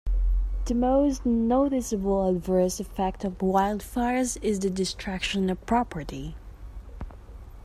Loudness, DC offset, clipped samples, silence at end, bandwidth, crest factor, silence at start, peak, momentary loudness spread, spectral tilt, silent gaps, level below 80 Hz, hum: -26 LUFS; under 0.1%; under 0.1%; 0 s; 14 kHz; 16 dB; 0.05 s; -10 dBFS; 19 LU; -5.5 dB/octave; none; -34 dBFS; none